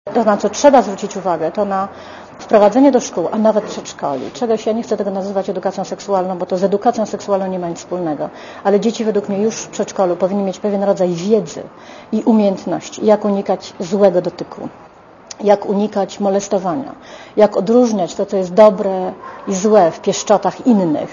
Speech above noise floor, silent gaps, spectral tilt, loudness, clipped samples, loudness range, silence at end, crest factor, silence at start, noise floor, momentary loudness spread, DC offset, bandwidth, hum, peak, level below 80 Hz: 22 dB; none; -5.5 dB/octave; -16 LUFS; under 0.1%; 5 LU; 0 s; 16 dB; 0.05 s; -38 dBFS; 13 LU; under 0.1%; 7.4 kHz; none; 0 dBFS; -58 dBFS